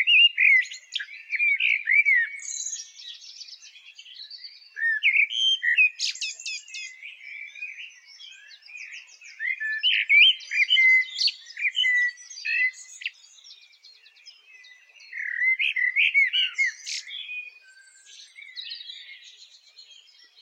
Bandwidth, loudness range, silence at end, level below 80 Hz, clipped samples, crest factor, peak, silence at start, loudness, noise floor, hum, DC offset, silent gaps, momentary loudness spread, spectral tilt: 11 kHz; 14 LU; 0.6 s; -80 dBFS; under 0.1%; 20 dB; -6 dBFS; 0 s; -21 LUFS; -54 dBFS; none; under 0.1%; none; 23 LU; 7.5 dB/octave